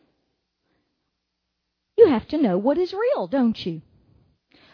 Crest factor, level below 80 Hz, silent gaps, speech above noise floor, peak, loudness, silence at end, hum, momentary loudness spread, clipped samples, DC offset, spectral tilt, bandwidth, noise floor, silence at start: 20 dB; -60 dBFS; none; 56 dB; -2 dBFS; -21 LUFS; 0.95 s; none; 13 LU; under 0.1%; under 0.1%; -8.5 dB/octave; 5.4 kHz; -78 dBFS; 2 s